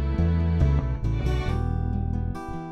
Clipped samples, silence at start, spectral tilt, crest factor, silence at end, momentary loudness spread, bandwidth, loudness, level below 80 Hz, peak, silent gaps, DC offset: under 0.1%; 0 s; -8.5 dB/octave; 14 dB; 0 s; 7 LU; 6.6 kHz; -26 LUFS; -28 dBFS; -10 dBFS; none; under 0.1%